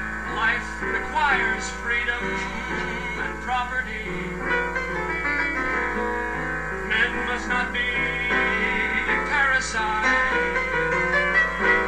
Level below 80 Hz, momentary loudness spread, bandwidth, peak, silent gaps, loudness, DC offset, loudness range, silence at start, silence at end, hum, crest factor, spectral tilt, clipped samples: -40 dBFS; 8 LU; 13 kHz; -8 dBFS; none; -23 LUFS; 0.6%; 5 LU; 0 s; 0 s; none; 16 dB; -4 dB/octave; under 0.1%